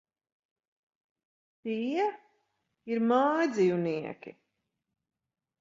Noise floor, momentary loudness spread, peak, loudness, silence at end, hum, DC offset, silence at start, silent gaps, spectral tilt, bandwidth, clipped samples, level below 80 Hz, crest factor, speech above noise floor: -83 dBFS; 19 LU; -12 dBFS; -29 LUFS; 1.3 s; none; under 0.1%; 1.65 s; none; -6.5 dB/octave; 7.6 kHz; under 0.1%; -80 dBFS; 20 dB; 54 dB